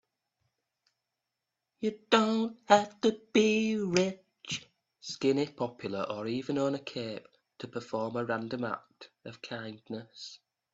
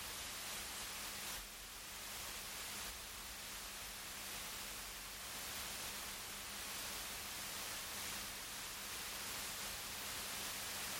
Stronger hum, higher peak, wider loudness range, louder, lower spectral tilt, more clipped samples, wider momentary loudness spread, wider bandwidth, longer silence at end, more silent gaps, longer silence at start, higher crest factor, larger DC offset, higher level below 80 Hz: neither; first, -6 dBFS vs -32 dBFS; first, 9 LU vs 2 LU; first, -31 LUFS vs -45 LUFS; first, -4.5 dB/octave vs -0.5 dB/octave; neither; first, 20 LU vs 4 LU; second, 8 kHz vs 17 kHz; first, 0.35 s vs 0 s; neither; first, 1.8 s vs 0 s; first, 26 dB vs 16 dB; neither; second, -74 dBFS vs -64 dBFS